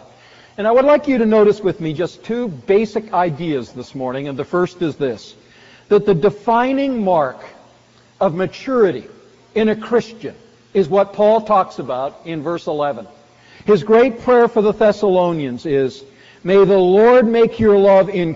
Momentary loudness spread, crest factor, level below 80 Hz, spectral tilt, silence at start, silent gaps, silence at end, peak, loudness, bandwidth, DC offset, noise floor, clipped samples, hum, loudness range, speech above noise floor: 13 LU; 12 dB; -50 dBFS; -5.5 dB/octave; 0.6 s; none; 0 s; -4 dBFS; -16 LUFS; 7.6 kHz; under 0.1%; -50 dBFS; under 0.1%; none; 6 LU; 35 dB